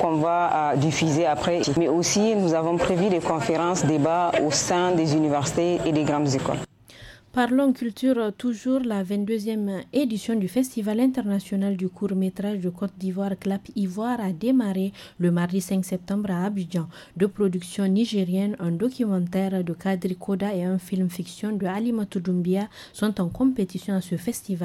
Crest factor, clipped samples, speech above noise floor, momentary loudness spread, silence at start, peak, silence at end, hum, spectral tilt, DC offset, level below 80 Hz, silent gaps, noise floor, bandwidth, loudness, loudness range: 14 dB; under 0.1%; 23 dB; 7 LU; 0 s; -10 dBFS; 0 s; none; -5.5 dB/octave; under 0.1%; -56 dBFS; none; -47 dBFS; 14.5 kHz; -24 LUFS; 4 LU